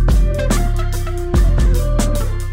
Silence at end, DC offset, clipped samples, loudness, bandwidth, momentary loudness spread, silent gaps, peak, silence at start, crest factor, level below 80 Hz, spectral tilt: 0 s; under 0.1%; under 0.1%; -18 LUFS; 16 kHz; 6 LU; none; -4 dBFS; 0 s; 10 dB; -16 dBFS; -6 dB/octave